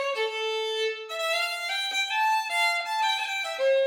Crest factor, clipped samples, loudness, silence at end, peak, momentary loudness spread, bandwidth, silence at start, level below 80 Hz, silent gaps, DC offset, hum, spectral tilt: 12 dB; under 0.1%; -26 LUFS; 0 s; -14 dBFS; 5 LU; 20 kHz; 0 s; under -90 dBFS; none; under 0.1%; none; 3.5 dB/octave